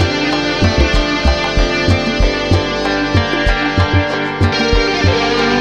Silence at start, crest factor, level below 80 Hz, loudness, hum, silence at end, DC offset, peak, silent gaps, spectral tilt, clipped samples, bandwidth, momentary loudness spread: 0 s; 12 dB; -20 dBFS; -14 LUFS; none; 0 s; 0.3%; 0 dBFS; none; -5.5 dB/octave; under 0.1%; 9.2 kHz; 2 LU